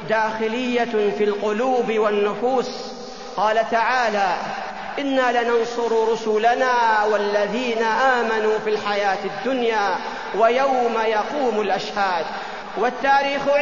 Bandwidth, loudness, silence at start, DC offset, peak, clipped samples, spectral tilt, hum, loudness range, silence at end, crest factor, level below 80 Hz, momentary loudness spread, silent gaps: 7.4 kHz; -20 LUFS; 0 s; 0.6%; -6 dBFS; under 0.1%; -4 dB/octave; none; 2 LU; 0 s; 16 dB; -56 dBFS; 8 LU; none